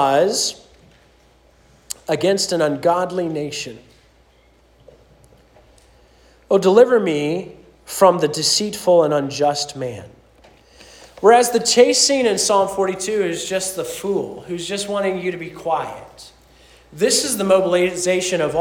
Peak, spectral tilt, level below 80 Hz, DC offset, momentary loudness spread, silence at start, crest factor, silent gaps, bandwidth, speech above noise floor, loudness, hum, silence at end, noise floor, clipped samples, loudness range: 0 dBFS; -3 dB/octave; -56 dBFS; under 0.1%; 15 LU; 0 s; 18 dB; none; 18 kHz; 36 dB; -18 LUFS; none; 0 s; -54 dBFS; under 0.1%; 8 LU